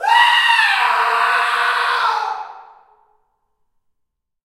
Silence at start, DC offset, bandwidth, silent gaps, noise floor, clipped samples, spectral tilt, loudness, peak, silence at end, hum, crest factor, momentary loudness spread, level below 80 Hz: 0 s; under 0.1%; 16 kHz; none; -74 dBFS; under 0.1%; 3 dB/octave; -14 LUFS; 0 dBFS; 1.85 s; none; 18 dB; 13 LU; -72 dBFS